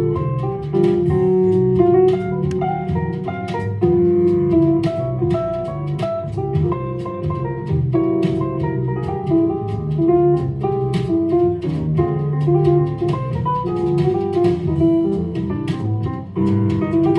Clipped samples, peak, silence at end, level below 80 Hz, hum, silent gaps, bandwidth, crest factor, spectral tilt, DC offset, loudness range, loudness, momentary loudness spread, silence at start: under 0.1%; -2 dBFS; 0 s; -42 dBFS; none; none; 6.6 kHz; 14 dB; -10 dB/octave; under 0.1%; 4 LU; -19 LUFS; 8 LU; 0 s